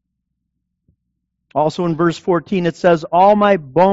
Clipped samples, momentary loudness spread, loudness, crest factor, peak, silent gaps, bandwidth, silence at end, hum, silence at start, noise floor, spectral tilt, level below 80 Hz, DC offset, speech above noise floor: under 0.1%; 8 LU; -15 LUFS; 14 dB; -2 dBFS; none; 8 kHz; 0 s; none; 1.55 s; -74 dBFS; -5.5 dB/octave; -54 dBFS; under 0.1%; 60 dB